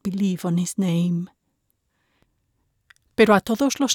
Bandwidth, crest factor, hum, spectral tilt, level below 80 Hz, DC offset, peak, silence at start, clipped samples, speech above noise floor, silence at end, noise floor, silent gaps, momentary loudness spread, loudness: 17.5 kHz; 18 dB; none; -5 dB/octave; -58 dBFS; under 0.1%; -4 dBFS; 0.05 s; under 0.1%; 52 dB; 0 s; -72 dBFS; none; 12 LU; -21 LUFS